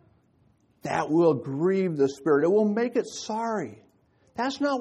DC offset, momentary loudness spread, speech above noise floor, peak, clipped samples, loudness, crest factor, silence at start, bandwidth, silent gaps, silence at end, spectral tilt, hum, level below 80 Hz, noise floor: under 0.1%; 10 LU; 39 dB; -10 dBFS; under 0.1%; -25 LUFS; 18 dB; 0.85 s; 11.5 kHz; none; 0 s; -6 dB/octave; none; -70 dBFS; -64 dBFS